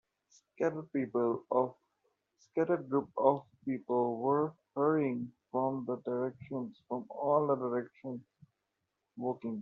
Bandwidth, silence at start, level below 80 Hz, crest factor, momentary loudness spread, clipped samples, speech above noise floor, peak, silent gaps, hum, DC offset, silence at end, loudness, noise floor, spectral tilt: 7 kHz; 0.6 s; -80 dBFS; 22 dB; 11 LU; under 0.1%; 52 dB; -12 dBFS; none; none; under 0.1%; 0 s; -34 LUFS; -85 dBFS; -8.5 dB/octave